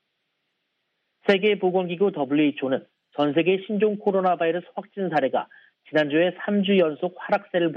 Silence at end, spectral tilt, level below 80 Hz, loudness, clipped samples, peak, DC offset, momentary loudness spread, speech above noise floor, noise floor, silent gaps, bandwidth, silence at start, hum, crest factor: 0 s; -8 dB/octave; -76 dBFS; -23 LUFS; under 0.1%; -6 dBFS; under 0.1%; 9 LU; 54 dB; -76 dBFS; none; 6.6 kHz; 1.25 s; none; 18 dB